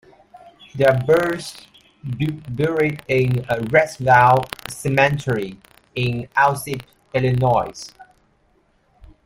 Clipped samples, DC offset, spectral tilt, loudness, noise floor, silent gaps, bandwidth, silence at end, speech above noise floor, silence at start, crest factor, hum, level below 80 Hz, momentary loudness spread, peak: under 0.1%; under 0.1%; -6 dB/octave; -19 LUFS; -61 dBFS; none; 16 kHz; 1.2 s; 42 dB; 0.35 s; 20 dB; none; -50 dBFS; 16 LU; -2 dBFS